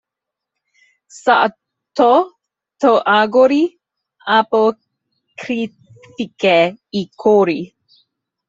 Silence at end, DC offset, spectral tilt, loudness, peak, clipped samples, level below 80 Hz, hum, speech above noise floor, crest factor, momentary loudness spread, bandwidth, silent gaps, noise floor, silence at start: 0.8 s; under 0.1%; -5.5 dB/octave; -15 LUFS; -2 dBFS; under 0.1%; -64 dBFS; none; 68 dB; 16 dB; 15 LU; 8 kHz; none; -83 dBFS; 1.15 s